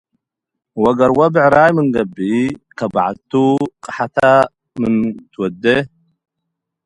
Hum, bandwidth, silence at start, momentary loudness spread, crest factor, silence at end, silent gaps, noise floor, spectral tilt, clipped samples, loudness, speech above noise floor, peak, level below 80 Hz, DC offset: none; 11 kHz; 0.75 s; 12 LU; 16 dB; 1 s; none; -81 dBFS; -7 dB/octave; under 0.1%; -15 LUFS; 66 dB; 0 dBFS; -50 dBFS; under 0.1%